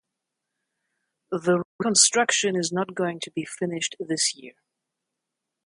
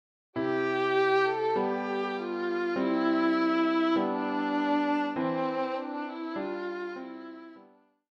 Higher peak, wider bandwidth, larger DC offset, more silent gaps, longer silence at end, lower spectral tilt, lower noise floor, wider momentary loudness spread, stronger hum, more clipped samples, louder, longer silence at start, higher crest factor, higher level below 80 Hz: first, -4 dBFS vs -14 dBFS; first, 11.5 kHz vs 7 kHz; neither; first, 1.65-1.79 s vs none; first, 1.15 s vs 0.55 s; second, -2.5 dB/octave vs -6.5 dB/octave; first, -84 dBFS vs -59 dBFS; first, 14 LU vs 11 LU; neither; neither; first, -23 LUFS vs -29 LUFS; first, 1.3 s vs 0.35 s; first, 22 dB vs 14 dB; first, -74 dBFS vs -80 dBFS